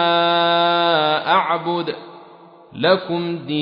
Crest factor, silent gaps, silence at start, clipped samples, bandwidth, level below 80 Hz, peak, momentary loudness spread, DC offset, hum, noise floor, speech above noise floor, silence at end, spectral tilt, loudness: 16 dB; none; 0 s; under 0.1%; 5.4 kHz; -68 dBFS; -2 dBFS; 8 LU; under 0.1%; none; -44 dBFS; 23 dB; 0 s; -7.5 dB/octave; -18 LUFS